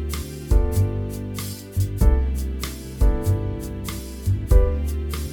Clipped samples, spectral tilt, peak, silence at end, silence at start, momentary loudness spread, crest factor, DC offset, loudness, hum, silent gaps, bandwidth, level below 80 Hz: under 0.1%; -6.5 dB/octave; -4 dBFS; 0 s; 0 s; 10 LU; 18 dB; under 0.1%; -24 LUFS; none; none; 19.5 kHz; -22 dBFS